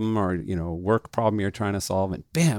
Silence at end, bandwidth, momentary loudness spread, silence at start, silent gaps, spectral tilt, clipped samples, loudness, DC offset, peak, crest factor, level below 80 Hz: 0 s; 17 kHz; 5 LU; 0 s; none; -6 dB/octave; under 0.1%; -26 LUFS; under 0.1%; -8 dBFS; 16 dB; -52 dBFS